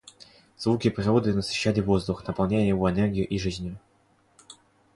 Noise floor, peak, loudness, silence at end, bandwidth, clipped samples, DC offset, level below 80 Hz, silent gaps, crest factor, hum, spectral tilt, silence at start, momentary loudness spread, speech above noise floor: -64 dBFS; -10 dBFS; -25 LUFS; 0.4 s; 11.5 kHz; under 0.1%; under 0.1%; -46 dBFS; none; 18 dB; none; -6.5 dB/octave; 0.2 s; 8 LU; 39 dB